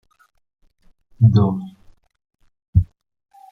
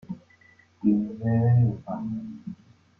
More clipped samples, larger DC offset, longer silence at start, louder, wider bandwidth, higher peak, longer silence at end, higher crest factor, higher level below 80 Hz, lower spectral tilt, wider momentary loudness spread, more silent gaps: neither; neither; first, 1.2 s vs 0.1 s; first, -18 LUFS vs -25 LUFS; first, 4.6 kHz vs 2.7 kHz; first, -2 dBFS vs -10 dBFS; first, 0.65 s vs 0.45 s; about the same, 20 dB vs 16 dB; first, -38 dBFS vs -58 dBFS; about the same, -11 dB/octave vs -12 dB/octave; second, 17 LU vs 20 LU; first, 2.68-2.73 s vs none